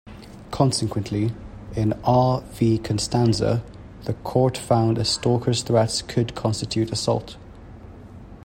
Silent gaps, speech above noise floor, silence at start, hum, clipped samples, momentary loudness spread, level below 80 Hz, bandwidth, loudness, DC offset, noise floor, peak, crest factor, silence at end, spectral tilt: none; 20 dB; 0.05 s; none; under 0.1%; 22 LU; -44 dBFS; 16 kHz; -22 LUFS; under 0.1%; -41 dBFS; -4 dBFS; 20 dB; 0.05 s; -6 dB/octave